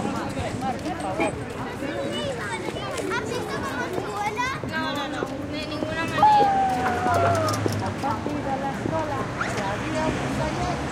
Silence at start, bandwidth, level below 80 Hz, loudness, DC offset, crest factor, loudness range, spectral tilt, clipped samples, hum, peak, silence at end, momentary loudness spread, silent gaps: 0 s; 16.5 kHz; -46 dBFS; -25 LUFS; under 0.1%; 18 dB; 6 LU; -5 dB/octave; under 0.1%; none; -6 dBFS; 0 s; 8 LU; none